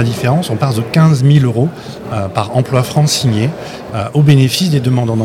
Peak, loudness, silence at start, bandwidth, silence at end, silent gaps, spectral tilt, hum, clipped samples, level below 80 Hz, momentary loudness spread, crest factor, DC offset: 0 dBFS; -13 LUFS; 0 s; 16 kHz; 0 s; none; -6 dB/octave; none; 0.3%; -44 dBFS; 11 LU; 12 dB; under 0.1%